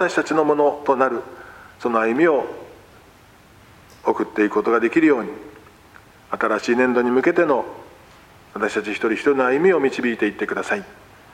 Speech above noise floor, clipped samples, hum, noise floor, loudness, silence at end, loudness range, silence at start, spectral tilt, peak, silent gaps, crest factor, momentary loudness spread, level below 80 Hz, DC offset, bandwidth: 30 dB; under 0.1%; none; -49 dBFS; -20 LUFS; 0.4 s; 3 LU; 0 s; -5.5 dB/octave; -2 dBFS; none; 18 dB; 15 LU; -60 dBFS; under 0.1%; 14.5 kHz